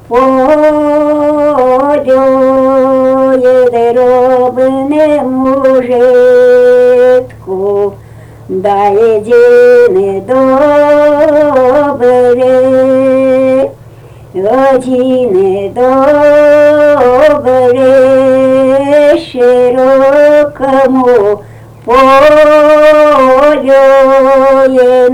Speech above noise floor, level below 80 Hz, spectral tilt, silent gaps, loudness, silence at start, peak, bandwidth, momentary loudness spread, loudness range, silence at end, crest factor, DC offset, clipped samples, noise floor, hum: 26 dB; -40 dBFS; -6 dB/octave; none; -6 LUFS; 0.1 s; 0 dBFS; 11 kHz; 6 LU; 3 LU; 0 s; 6 dB; under 0.1%; 0.4%; -32 dBFS; none